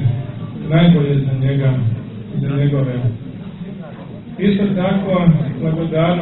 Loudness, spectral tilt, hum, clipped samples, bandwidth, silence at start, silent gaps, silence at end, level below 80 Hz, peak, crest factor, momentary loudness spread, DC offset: -17 LUFS; -12.5 dB/octave; none; under 0.1%; 4.1 kHz; 0 s; none; 0 s; -40 dBFS; 0 dBFS; 16 dB; 17 LU; under 0.1%